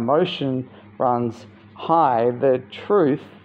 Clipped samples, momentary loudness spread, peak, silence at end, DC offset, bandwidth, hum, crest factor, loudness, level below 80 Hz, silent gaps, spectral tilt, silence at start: under 0.1%; 11 LU; -6 dBFS; 0.15 s; under 0.1%; 7.6 kHz; none; 16 dB; -21 LUFS; -66 dBFS; none; -8 dB/octave; 0 s